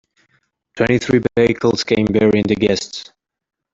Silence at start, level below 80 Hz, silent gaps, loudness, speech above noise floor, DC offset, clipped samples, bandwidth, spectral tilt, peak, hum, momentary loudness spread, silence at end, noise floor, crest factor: 0.75 s; -46 dBFS; none; -16 LUFS; 48 dB; under 0.1%; under 0.1%; 7.8 kHz; -5.5 dB/octave; -2 dBFS; none; 7 LU; 0.7 s; -63 dBFS; 16 dB